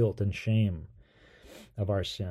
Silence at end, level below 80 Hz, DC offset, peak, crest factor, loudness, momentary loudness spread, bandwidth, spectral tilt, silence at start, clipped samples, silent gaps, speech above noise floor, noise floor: 0 s; -52 dBFS; under 0.1%; -16 dBFS; 16 dB; -31 LUFS; 24 LU; 11.5 kHz; -7.5 dB/octave; 0 s; under 0.1%; none; 29 dB; -58 dBFS